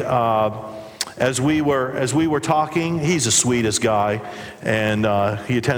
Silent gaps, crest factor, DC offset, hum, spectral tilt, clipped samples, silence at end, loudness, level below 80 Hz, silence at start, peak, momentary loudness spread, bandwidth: none; 16 dB; under 0.1%; none; -4 dB/octave; under 0.1%; 0 s; -20 LUFS; -52 dBFS; 0 s; -4 dBFS; 12 LU; over 20 kHz